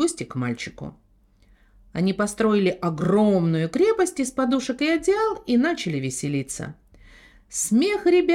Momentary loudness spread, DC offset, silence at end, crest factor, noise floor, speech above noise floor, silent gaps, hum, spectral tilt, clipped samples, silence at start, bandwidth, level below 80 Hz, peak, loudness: 12 LU; under 0.1%; 0 s; 14 dB; -57 dBFS; 35 dB; none; none; -5 dB/octave; under 0.1%; 0 s; 15.5 kHz; -54 dBFS; -10 dBFS; -23 LUFS